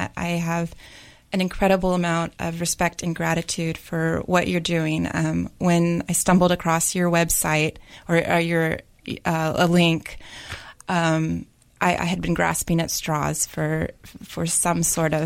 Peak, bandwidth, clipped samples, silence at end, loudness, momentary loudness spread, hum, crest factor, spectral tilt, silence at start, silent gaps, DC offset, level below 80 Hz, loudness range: -6 dBFS; 16.5 kHz; under 0.1%; 0 s; -22 LUFS; 10 LU; none; 18 dB; -4.5 dB/octave; 0 s; none; under 0.1%; -44 dBFS; 3 LU